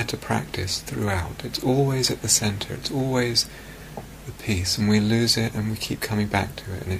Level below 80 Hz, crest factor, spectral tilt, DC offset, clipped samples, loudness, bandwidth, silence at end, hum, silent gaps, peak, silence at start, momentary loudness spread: -44 dBFS; 20 dB; -4 dB/octave; under 0.1%; under 0.1%; -23 LUFS; 15.5 kHz; 0 s; none; none; -4 dBFS; 0 s; 13 LU